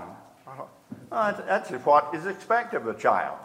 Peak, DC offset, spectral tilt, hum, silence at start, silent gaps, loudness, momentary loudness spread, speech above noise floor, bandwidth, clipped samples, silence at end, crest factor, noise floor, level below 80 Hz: -6 dBFS; under 0.1%; -5.5 dB/octave; none; 0 s; none; -25 LUFS; 21 LU; 21 dB; 15.5 kHz; under 0.1%; 0 s; 20 dB; -46 dBFS; -74 dBFS